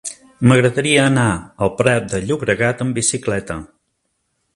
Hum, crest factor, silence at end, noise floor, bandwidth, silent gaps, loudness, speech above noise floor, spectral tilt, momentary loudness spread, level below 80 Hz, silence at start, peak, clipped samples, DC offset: none; 18 dB; 0.9 s; -70 dBFS; 11.5 kHz; none; -17 LUFS; 53 dB; -5 dB/octave; 10 LU; -44 dBFS; 0.05 s; 0 dBFS; under 0.1%; under 0.1%